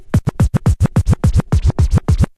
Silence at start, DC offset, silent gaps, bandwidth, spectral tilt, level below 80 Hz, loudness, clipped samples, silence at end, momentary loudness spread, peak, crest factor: 0 s; under 0.1%; none; 13 kHz; -7.5 dB/octave; -18 dBFS; -15 LUFS; under 0.1%; 0.15 s; 2 LU; -4 dBFS; 10 dB